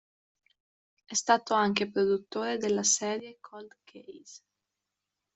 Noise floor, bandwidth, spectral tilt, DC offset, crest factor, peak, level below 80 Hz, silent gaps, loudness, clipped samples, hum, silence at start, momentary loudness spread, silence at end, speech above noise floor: -87 dBFS; 8.2 kHz; -2.5 dB/octave; under 0.1%; 24 dB; -8 dBFS; -74 dBFS; none; -28 LUFS; under 0.1%; none; 1.1 s; 23 LU; 1 s; 57 dB